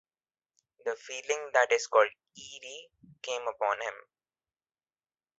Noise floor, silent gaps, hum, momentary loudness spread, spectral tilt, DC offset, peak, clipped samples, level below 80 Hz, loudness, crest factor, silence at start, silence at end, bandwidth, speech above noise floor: under -90 dBFS; none; none; 20 LU; 0 dB/octave; under 0.1%; -8 dBFS; under 0.1%; -80 dBFS; -30 LUFS; 24 dB; 0.85 s; 1.4 s; 8.2 kHz; over 60 dB